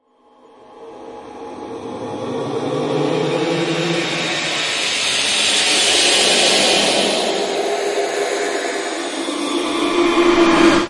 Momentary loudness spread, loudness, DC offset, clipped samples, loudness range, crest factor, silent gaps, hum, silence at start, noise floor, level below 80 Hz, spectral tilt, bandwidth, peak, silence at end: 17 LU; -16 LUFS; under 0.1%; under 0.1%; 9 LU; 18 dB; none; none; 0.7 s; -50 dBFS; -50 dBFS; -2.5 dB/octave; 11.5 kHz; 0 dBFS; 0 s